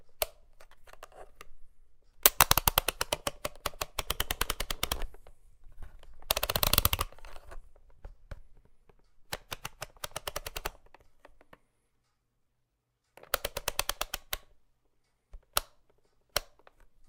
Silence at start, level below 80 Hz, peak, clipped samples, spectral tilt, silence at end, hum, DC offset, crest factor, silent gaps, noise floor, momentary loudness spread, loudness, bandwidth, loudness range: 0 s; -46 dBFS; 0 dBFS; under 0.1%; -1.5 dB/octave; 0.65 s; none; under 0.1%; 36 dB; none; -79 dBFS; 27 LU; -31 LUFS; 18 kHz; 15 LU